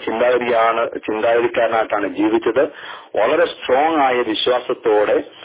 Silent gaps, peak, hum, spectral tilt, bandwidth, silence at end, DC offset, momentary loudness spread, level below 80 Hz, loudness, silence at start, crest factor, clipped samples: none; -4 dBFS; none; -8 dB/octave; 4 kHz; 0 s; under 0.1%; 5 LU; -56 dBFS; -17 LUFS; 0 s; 14 dB; under 0.1%